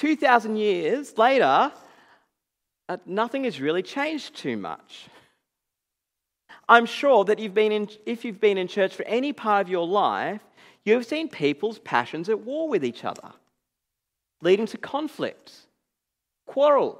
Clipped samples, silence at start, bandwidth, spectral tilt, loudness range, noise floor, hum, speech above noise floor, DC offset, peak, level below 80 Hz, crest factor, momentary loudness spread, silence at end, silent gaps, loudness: under 0.1%; 0 s; 13 kHz; -5 dB/octave; 7 LU; -85 dBFS; none; 61 dB; under 0.1%; 0 dBFS; -82 dBFS; 24 dB; 14 LU; 0.05 s; none; -24 LUFS